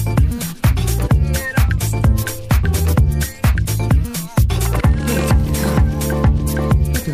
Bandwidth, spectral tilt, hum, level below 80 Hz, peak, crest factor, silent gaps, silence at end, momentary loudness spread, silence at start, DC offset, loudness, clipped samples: 15.5 kHz; -6 dB/octave; none; -18 dBFS; -2 dBFS; 12 dB; none; 0 s; 2 LU; 0 s; under 0.1%; -17 LUFS; under 0.1%